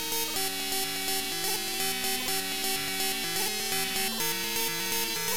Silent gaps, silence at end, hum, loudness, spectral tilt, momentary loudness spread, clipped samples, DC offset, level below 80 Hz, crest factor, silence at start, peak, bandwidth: none; 0 s; none; -28 LUFS; -0.5 dB/octave; 1 LU; under 0.1%; 0.9%; -60 dBFS; 16 dB; 0 s; -14 dBFS; 17 kHz